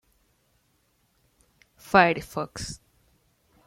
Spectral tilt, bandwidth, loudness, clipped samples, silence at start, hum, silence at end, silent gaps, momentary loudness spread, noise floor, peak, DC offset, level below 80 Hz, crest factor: -4.5 dB/octave; 16.5 kHz; -24 LUFS; under 0.1%; 1.9 s; none; 0.9 s; none; 18 LU; -69 dBFS; -4 dBFS; under 0.1%; -56 dBFS; 26 dB